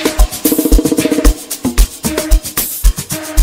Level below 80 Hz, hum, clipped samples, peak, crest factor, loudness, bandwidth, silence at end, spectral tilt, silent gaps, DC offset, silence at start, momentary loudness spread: -14 dBFS; none; 2%; 0 dBFS; 12 dB; -14 LUFS; 18 kHz; 0 s; -4.5 dB/octave; none; under 0.1%; 0 s; 6 LU